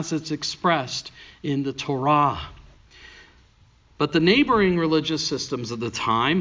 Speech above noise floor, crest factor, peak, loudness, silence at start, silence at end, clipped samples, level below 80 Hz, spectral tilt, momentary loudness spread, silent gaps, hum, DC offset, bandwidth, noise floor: 34 dB; 18 dB; -6 dBFS; -22 LUFS; 0 s; 0 s; under 0.1%; -50 dBFS; -5 dB/octave; 13 LU; none; none; under 0.1%; 7.6 kHz; -56 dBFS